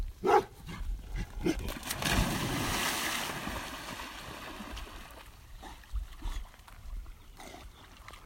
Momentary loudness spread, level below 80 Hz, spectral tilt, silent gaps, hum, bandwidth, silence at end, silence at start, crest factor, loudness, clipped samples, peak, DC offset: 21 LU; -42 dBFS; -3.5 dB/octave; none; none; 16.5 kHz; 0 s; 0 s; 24 dB; -34 LUFS; under 0.1%; -12 dBFS; under 0.1%